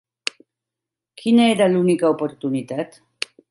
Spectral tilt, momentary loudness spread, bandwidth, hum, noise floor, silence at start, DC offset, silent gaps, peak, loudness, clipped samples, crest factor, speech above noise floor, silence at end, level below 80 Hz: -5.5 dB/octave; 15 LU; 11.5 kHz; none; -86 dBFS; 1.2 s; under 0.1%; none; -2 dBFS; -19 LUFS; under 0.1%; 20 dB; 68 dB; 0.65 s; -70 dBFS